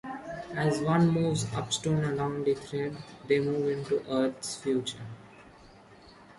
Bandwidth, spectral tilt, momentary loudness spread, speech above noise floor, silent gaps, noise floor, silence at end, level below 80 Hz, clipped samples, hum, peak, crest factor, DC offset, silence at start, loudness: 11.5 kHz; -5.5 dB/octave; 14 LU; 25 dB; none; -54 dBFS; 0.05 s; -60 dBFS; under 0.1%; none; -12 dBFS; 18 dB; under 0.1%; 0.05 s; -30 LUFS